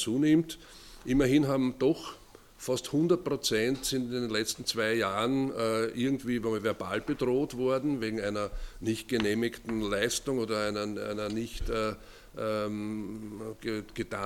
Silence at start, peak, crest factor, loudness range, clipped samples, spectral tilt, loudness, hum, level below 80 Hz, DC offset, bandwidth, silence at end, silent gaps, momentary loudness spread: 0 s; -12 dBFS; 18 dB; 4 LU; under 0.1%; -5 dB/octave; -30 LUFS; none; -48 dBFS; under 0.1%; 17 kHz; 0 s; none; 11 LU